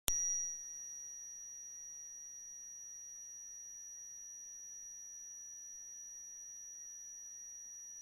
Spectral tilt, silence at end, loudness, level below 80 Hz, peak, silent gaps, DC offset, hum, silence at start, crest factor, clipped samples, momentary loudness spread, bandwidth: 1.5 dB/octave; 0 s; -45 LUFS; -66 dBFS; -10 dBFS; none; under 0.1%; none; 0.05 s; 36 dB; under 0.1%; 8 LU; 16 kHz